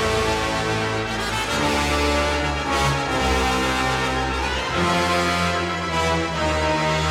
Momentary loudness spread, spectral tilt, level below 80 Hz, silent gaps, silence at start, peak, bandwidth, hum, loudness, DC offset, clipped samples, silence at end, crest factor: 3 LU; -4 dB/octave; -32 dBFS; none; 0 s; -8 dBFS; 16.5 kHz; none; -21 LUFS; under 0.1%; under 0.1%; 0 s; 14 dB